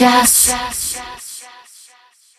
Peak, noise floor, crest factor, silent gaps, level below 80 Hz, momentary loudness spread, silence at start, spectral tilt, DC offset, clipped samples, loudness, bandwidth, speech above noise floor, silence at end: 0 dBFS; -50 dBFS; 18 dB; none; -44 dBFS; 22 LU; 0 s; -1 dB/octave; under 0.1%; under 0.1%; -13 LUFS; 15.5 kHz; 36 dB; 0.95 s